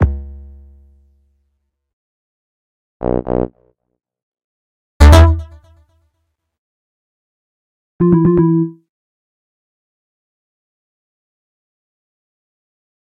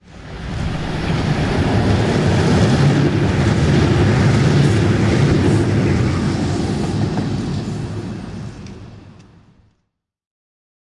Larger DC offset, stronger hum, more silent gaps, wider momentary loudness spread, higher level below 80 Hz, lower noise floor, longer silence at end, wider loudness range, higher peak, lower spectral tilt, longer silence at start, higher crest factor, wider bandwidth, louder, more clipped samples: neither; neither; first, 1.93-3.00 s, 4.23-4.32 s, 4.44-5.00 s, 6.58-7.99 s vs none; about the same, 17 LU vs 15 LU; first, -22 dBFS vs -32 dBFS; about the same, -70 dBFS vs -72 dBFS; first, 4.3 s vs 1.9 s; about the same, 10 LU vs 12 LU; first, 0 dBFS vs -4 dBFS; about the same, -7.5 dB/octave vs -7 dB/octave; about the same, 0 s vs 0.1 s; about the same, 18 dB vs 14 dB; first, 13 kHz vs 11 kHz; first, -13 LUFS vs -16 LUFS; neither